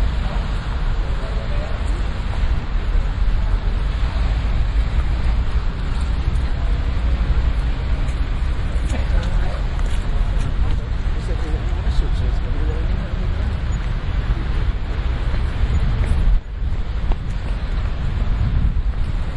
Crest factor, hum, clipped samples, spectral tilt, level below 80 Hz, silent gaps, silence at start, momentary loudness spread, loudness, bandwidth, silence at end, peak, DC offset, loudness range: 14 dB; none; under 0.1%; -7 dB/octave; -20 dBFS; none; 0 s; 4 LU; -23 LUFS; 8.6 kHz; 0 s; -4 dBFS; under 0.1%; 1 LU